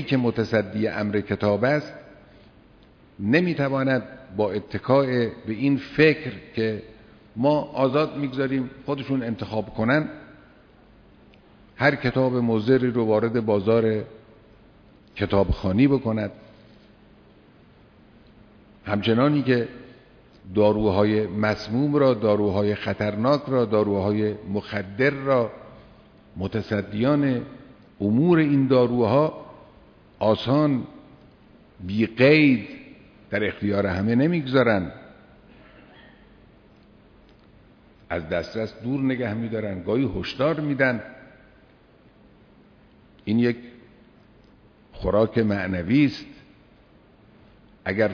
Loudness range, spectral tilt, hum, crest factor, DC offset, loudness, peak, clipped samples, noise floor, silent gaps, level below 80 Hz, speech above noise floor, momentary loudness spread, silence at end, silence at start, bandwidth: 7 LU; -8.5 dB/octave; none; 18 dB; under 0.1%; -23 LUFS; -6 dBFS; under 0.1%; -54 dBFS; none; -48 dBFS; 32 dB; 12 LU; 0 s; 0 s; 5.4 kHz